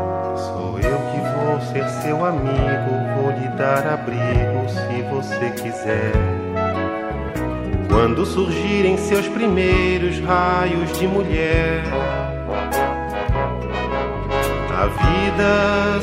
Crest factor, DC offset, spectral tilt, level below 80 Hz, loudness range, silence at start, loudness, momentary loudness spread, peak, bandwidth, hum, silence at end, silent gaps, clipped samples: 18 dB; under 0.1%; -6.5 dB/octave; -30 dBFS; 3 LU; 0 s; -20 LUFS; 7 LU; -2 dBFS; 16 kHz; none; 0 s; none; under 0.1%